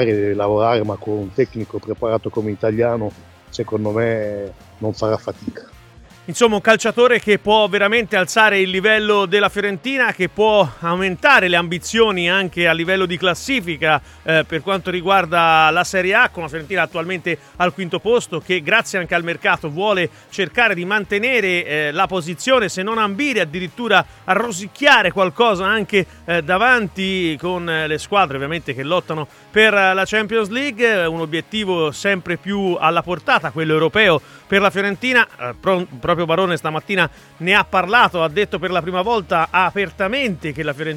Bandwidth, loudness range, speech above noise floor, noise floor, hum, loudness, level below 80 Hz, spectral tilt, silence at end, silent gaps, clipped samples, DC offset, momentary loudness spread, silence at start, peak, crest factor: 16.5 kHz; 5 LU; 26 dB; -44 dBFS; none; -17 LUFS; -50 dBFS; -4.5 dB/octave; 0 s; none; under 0.1%; under 0.1%; 9 LU; 0 s; 0 dBFS; 18 dB